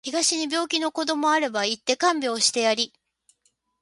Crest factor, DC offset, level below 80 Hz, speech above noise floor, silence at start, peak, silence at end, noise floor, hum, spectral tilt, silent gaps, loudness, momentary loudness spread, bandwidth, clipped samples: 18 dB; under 0.1%; -74 dBFS; 46 dB; 0.05 s; -6 dBFS; 0.95 s; -70 dBFS; none; -1 dB/octave; none; -23 LUFS; 4 LU; 11.5 kHz; under 0.1%